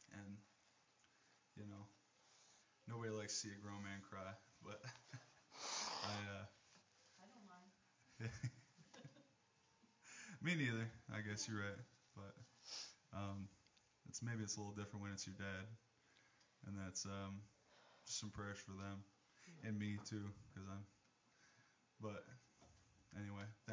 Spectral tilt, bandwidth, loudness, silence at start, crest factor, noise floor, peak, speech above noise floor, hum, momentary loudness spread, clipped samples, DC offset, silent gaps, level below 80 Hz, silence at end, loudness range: -4 dB/octave; 7.6 kHz; -50 LUFS; 0 s; 22 dB; -78 dBFS; -30 dBFS; 28 dB; none; 20 LU; under 0.1%; under 0.1%; none; -74 dBFS; 0 s; 9 LU